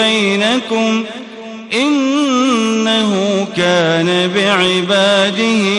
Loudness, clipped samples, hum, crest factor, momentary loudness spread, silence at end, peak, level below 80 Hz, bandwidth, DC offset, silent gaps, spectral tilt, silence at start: -13 LUFS; under 0.1%; none; 12 dB; 7 LU; 0 s; 0 dBFS; -56 dBFS; 11.5 kHz; under 0.1%; none; -4 dB/octave; 0 s